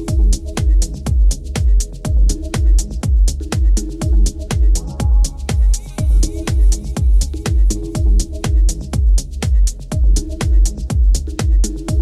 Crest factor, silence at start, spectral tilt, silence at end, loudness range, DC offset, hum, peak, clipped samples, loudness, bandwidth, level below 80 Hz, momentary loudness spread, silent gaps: 12 dB; 0 s; -5.5 dB/octave; 0 s; 0 LU; under 0.1%; none; -2 dBFS; under 0.1%; -18 LUFS; 12.5 kHz; -14 dBFS; 2 LU; none